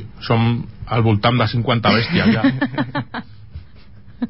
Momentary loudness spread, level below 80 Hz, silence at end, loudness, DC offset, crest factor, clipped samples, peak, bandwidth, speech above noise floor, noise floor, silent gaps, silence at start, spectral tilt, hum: 11 LU; -42 dBFS; 0 s; -18 LUFS; 0.8%; 16 dB; under 0.1%; -4 dBFS; 5.8 kHz; 27 dB; -43 dBFS; none; 0 s; -11 dB/octave; none